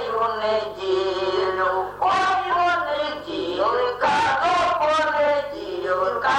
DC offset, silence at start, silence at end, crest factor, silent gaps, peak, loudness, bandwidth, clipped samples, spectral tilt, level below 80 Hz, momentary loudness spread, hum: under 0.1%; 0 s; 0 s; 12 dB; none; -8 dBFS; -22 LUFS; 16 kHz; under 0.1%; -4 dB/octave; -54 dBFS; 6 LU; none